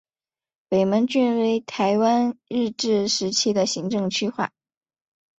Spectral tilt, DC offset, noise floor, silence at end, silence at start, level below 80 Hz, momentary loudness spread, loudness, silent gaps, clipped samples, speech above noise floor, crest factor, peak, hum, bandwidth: -4 dB/octave; under 0.1%; under -90 dBFS; 0.9 s; 0.7 s; -66 dBFS; 6 LU; -22 LUFS; none; under 0.1%; over 68 dB; 16 dB; -8 dBFS; none; 8.2 kHz